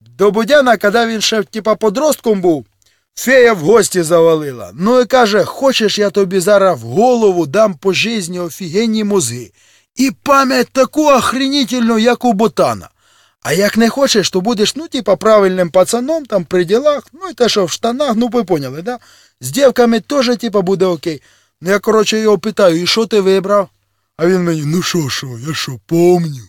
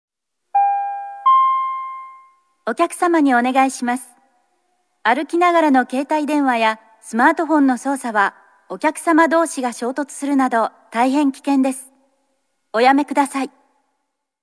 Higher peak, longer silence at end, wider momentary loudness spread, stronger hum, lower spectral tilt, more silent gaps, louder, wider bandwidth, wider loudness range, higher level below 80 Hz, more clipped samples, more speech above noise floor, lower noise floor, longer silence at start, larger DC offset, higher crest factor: about the same, 0 dBFS vs 0 dBFS; second, 0.05 s vs 0.95 s; about the same, 10 LU vs 11 LU; neither; first, -4.5 dB/octave vs -3 dB/octave; neither; first, -13 LUFS vs -18 LUFS; first, 18 kHz vs 11 kHz; about the same, 3 LU vs 3 LU; first, -52 dBFS vs -80 dBFS; neither; second, 40 dB vs 57 dB; second, -53 dBFS vs -74 dBFS; second, 0.2 s vs 0.55 s; neither; second, 12 dB vs 18 dB